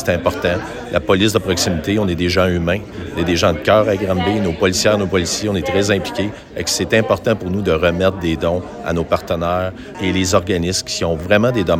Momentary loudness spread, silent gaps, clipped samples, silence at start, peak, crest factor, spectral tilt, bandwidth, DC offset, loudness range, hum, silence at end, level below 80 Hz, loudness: 7 LU; none; under 0.1%; 0 s; 0 dBFS; 16 dB; -4.5 dB/octave; 16.5 kHz; under 0.1%; 2 LU; none; 0 s; -38 dBFS; -17 LUFS